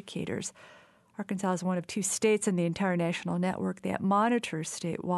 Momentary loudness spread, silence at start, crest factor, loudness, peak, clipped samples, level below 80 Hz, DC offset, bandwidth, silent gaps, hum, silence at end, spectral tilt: 10 LU; 0.05 s; 16 dB; -30 LUFS; -14 dBFS; under 0.1%; -70 dBFS; under 0.1%; 12 kHz; none; none; 0 s; -5 dB/octave